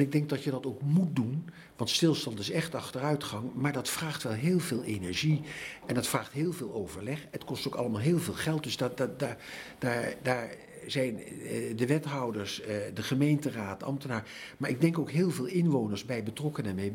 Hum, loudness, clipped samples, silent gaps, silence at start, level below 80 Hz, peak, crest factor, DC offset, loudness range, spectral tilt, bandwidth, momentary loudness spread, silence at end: none; -32 LUFS; under 0.1%; none; 0 s; -66 dBFS; -12 dBFS; 20 dB; under 0.1%; 3 LU; -5.5 dB/octave; 16.5 kHz; 9 LU; 0 s